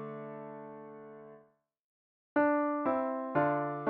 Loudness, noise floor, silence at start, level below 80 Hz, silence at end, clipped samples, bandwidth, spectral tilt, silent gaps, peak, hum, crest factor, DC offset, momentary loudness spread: -32 LUFS; -66 dBFS; 0 s; -76 dBFS; 0 s; under 0.1%; 4.5 kHz; -7 dB/octave; 1.79-2.36 s; -16 dBFS; none; 18 dB; under 0.1%; 20 LU